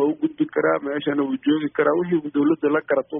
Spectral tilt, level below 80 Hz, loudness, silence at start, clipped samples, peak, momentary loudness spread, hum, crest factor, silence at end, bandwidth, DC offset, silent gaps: -5 dB/octave; -66 dBFS; -22 LUFS; 0 s; under 0.1%; -6 dBFS; 3 LU; none; 14 dB; 0 s; 3.7 kHz; under 0.1%; none